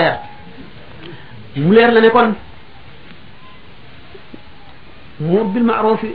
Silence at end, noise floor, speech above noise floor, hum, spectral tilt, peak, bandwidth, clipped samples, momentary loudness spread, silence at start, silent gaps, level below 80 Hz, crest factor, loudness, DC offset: 0 s; -41 dBFS; 29 dB; none; -9.5 dB/octave; 0 dBFS; 5 kHz; under 0.1%; 27 LU; 0 s; none; -48 dBFS; 16 dB; -14 LUFS; 2%